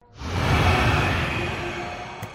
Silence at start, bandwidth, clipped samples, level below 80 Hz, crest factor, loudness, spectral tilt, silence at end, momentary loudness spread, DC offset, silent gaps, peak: 0.15 s; 16 kHz; under 0.1%; -34 dBFS; 16 dB; -23 LUFS; -5.5 dB/octave; 0 s; 12 LU; under 0.1%; none; -8 dBFS